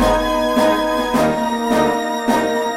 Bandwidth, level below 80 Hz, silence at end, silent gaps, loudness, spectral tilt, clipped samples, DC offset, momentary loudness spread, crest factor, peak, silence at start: 16.5 kHz; -34 dBFS; 0 s; none; -17 LUFS; -4.5 dB/octave; under 0.1%; under 0.1%; 2 LU; 14 dB; -4 dBFS; 0 s